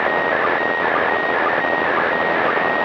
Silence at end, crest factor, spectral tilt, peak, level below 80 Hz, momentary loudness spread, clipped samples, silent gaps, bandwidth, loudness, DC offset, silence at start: 0 s; 12 dB; -5.5 dB/octave; -6 dBFS; -58 dBFS; 0 LU; under 0.1%; none; 7.6 kHz; -18 LUFS; under 0.1%; 0 s